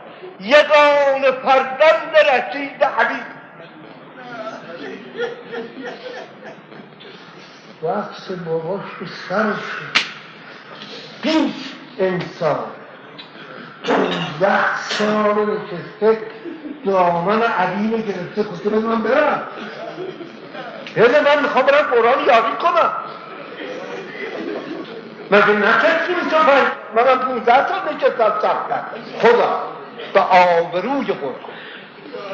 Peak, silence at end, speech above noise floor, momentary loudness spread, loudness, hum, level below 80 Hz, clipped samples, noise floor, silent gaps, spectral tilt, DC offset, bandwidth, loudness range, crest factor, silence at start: 0 dBFS; 0 s; 23 dB; 21 LU; -17 LUFS; none; -64 dBFS; under 0.1%; -40 dBFS; none; -2 dB/octave; under 0.1%; 8 kHz; 13 LU; 18 dB; 0 s